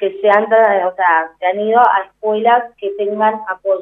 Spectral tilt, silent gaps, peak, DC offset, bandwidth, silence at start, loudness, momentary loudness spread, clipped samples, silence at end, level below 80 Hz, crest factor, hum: -6.5 dB/octave; none; 0 dBFS; under 0.1%; 4 kHz; 0 s; -14 LUFS; 8 LU; under 0.1%; 0 s; -68 dBFS; 14 dB; none